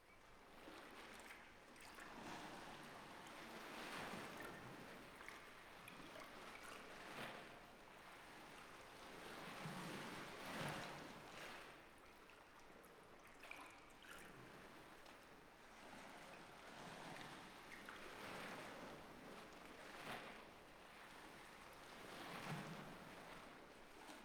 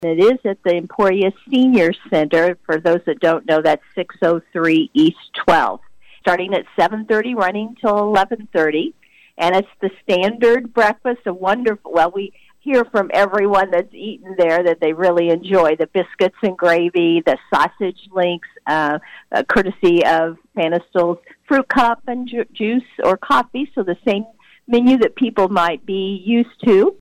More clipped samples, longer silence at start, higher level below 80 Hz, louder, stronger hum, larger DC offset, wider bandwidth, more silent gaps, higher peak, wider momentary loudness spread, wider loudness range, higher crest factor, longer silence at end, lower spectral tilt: neither; about the same, 0 s vs 0 s; second, -76 dBFS vs -52 dBFS; second, -56 LUFS vs -17 LUFS; neither; neither; first, over 20 kHz vs 14 kHz; neither; second, -34 dBFS vs -6 dBFS; first, 11 LU vs 8 LU; first, 7 LU vs 2 LU; first, 22 dB vs 10 dB; about the same, 0 s vs 0.05 s; second, -3.5 dB/octave vs -6 dB/octave